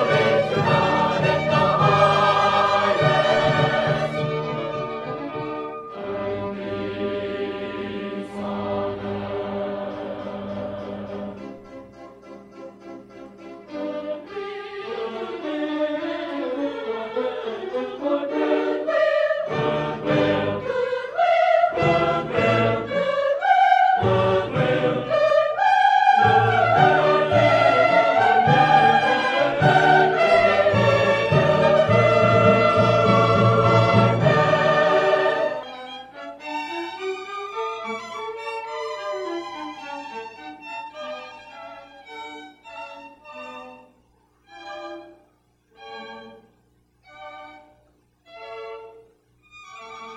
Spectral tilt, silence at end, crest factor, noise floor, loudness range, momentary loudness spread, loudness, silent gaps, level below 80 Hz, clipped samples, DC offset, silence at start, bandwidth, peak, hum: -6.5 dB/octave; 0 s; 18 dB; -62 dBFS; 21 LU; 21 LU; -20 LUFS; none; -54 dBFS; under 0.1%; under 0.1%; 0 s; 10 kHz; -4 dBFS; 60 Hz at -50 dBFS